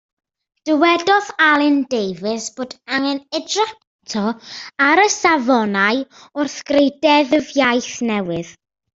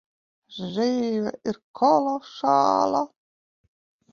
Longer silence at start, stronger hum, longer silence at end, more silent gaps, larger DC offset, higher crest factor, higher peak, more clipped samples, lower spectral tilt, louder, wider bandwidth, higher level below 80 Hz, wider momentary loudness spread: first, 0.65 s vs 0.5 s; neither; second, 0.45 s vs 1.05 s; about the same, 3.87-3.99 s vs 1.64-1.74 s; neither; about the same, 16 dB vs 18 dB; first, -2 dBFS vs -8 dBFS; neither; second, -3.5 dB/octave vs -5.5 dB/octave; first, -17 LUFS vs -23 LUFS; first, 8 kHz vs 7.2 kHz; first, -60 dBFS vs -68 dBFS; about the same, 13 LU vs 13 LU